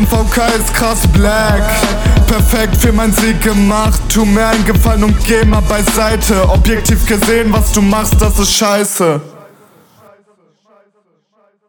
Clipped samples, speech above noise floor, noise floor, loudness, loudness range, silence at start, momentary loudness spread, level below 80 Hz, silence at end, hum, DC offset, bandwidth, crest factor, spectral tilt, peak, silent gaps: under 0.1%; 48 dB; -57 dBFS; -11 LUFS; 3 LU; 0 s; 2 LU; -16 dBFS; 2.3 s; none; under 0.1%; 19.5 kHz; 10 dB; -4.5 dB/octave; 0 dBFS; none